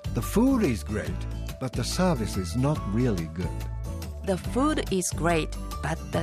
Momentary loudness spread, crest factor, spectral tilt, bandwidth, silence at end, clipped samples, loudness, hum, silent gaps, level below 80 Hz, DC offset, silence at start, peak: 10 LU; 16 dB; -5.5 dB/octave; 15.5 kHz; 0 s; under 0.1%; -28 LUFS; none; none; -36 dBFS; under 0.1%; 0 s; -12 dBFS